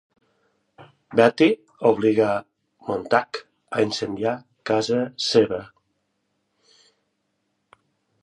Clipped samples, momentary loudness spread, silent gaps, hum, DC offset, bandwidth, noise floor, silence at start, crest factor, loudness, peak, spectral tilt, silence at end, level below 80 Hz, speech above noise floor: under 0.1%; 12 LU; none; none; under 0.1%; 10.5 kHz; -74 dBFS; 0.8 s; 22 dB; -22 LUFS; -2 dBFS; -5 dB/octave; 2.55 s; -64 dBFS; 53 dB